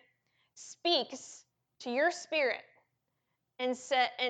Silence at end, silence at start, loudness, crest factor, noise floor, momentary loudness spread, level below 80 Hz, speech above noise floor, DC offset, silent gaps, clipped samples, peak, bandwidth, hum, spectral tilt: 0 s; 0.55 s; -32 LUFS; 20 dB; -83 dBFS; 20 LU; -88 dBFS; 51 dB; under 0.1%; none; under 0.1%; -16 dBFS; 9.4 kHz; none; -1 dB/octave